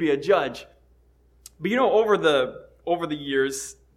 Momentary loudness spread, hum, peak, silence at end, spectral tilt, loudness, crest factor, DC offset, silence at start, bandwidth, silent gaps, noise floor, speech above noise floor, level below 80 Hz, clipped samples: 13 LU; none; -8 dBFS; 0.25 s; -4 dB/octave; -23 LUFS; 16 dB; under 0.1%; 0 s; 15 kHz; none; -58 dBFS; 36 dB; -58 dBFS; under 0.1%